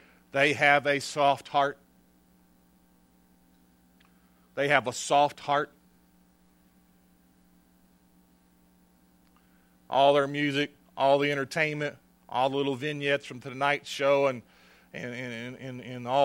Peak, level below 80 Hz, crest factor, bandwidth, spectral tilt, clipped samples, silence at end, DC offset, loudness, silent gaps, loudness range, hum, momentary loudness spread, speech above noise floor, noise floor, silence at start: -4 dBFS; -72 dBFS; 24 dB; 16.5 kHz; -4 dB/octave; under 0.1%; 0 s; under 0.1%; -27 LUFS; none; 7 LU; 60 Hz at -65 dBFS; 16 LU; 36 dB; -63 dBFS; 0.35 s